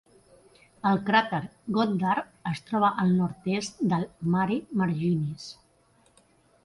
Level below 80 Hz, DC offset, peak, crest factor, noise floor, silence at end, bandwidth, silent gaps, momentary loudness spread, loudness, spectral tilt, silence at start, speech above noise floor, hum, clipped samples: -62 dBFS; under 0.1%; -8 dBFS; 20 dB; -63 dBFS; 1.1 s; 11.5 kHz; none; 10 LU; -27 LUFS; -6.5 dB/octave; 0.85 s; 37 dB; none; under 0.1%